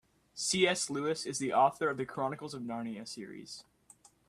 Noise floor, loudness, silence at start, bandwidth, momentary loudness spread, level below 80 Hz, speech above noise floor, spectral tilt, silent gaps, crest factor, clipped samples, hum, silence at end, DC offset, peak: -63 dBFS; -33 LUFS; 0.35 s; 14.5 kHz; 18 LU; -72 dBFS; 29 dB; -3 dB/octave; none; 22 dB; under 0.1%; none; 0.7 s; under 0.1%; -12 dBFS